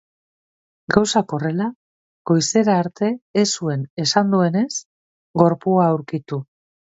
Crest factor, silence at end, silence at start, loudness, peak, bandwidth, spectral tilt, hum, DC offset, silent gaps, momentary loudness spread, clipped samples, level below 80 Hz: 20 dB; 0.5 s; 0.9 s; -20 LUFS; 0 dBFS; 8 kHz; -5 dB/octave; none; under 0.1%; 1.76-2.25 s, 3.22-3.34 s, 3.90-3.97 s, 4.85-5.34 s; 11 LU; under 0.1%; -58 dBFS